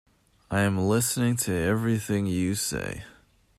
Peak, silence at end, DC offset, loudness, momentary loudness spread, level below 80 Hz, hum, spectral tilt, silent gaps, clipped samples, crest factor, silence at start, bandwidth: -12 dBFS; 0.5 s; under 0.1%; -26 LUFS; 8 LU; -54 dBFS; none; -5 dB/octave; none; under 0.1%; 14 dB; 0.5 s; 16 kHz